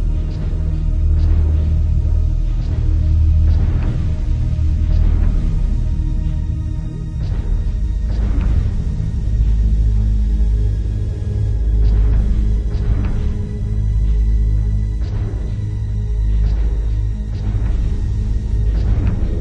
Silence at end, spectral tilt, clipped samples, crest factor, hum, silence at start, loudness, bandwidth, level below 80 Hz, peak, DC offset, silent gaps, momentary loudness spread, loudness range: 0 s; -9 dB/octave; under 0.1%; 12 dB; none; 0 s; -19 LUFS; 6 kHz; -16 dBFS; -4 dBFS; under 0.1%; none; 6 LU; 3 LU